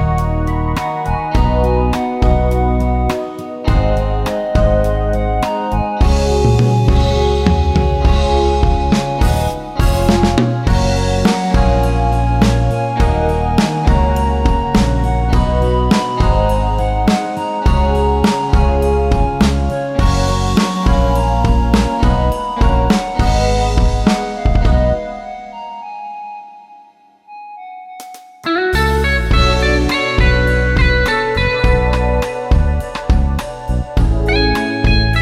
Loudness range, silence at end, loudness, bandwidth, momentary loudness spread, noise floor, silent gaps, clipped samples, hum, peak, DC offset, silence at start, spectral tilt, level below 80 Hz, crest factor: 4 LU; 0 s; -15 LUFS; 14 kHz; 7 LU; -46 dBFS; none; under 0.1%; none; 0 dBFS; under 0.1%; 0 s; -6.5 dB/octave; -16 dBFS; 14 dB